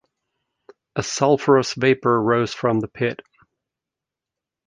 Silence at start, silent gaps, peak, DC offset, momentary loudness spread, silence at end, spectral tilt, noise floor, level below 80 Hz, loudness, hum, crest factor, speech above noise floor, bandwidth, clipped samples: 0.95 s; none; -2 dBFS; under 0.1%; 10 LU; 1.5 s; -5 dB/octave; -87 dBFS; -58 dBFS; -20 LUFS; none; 20 dB; 68 dB; 9.8 kHz; under 0.1%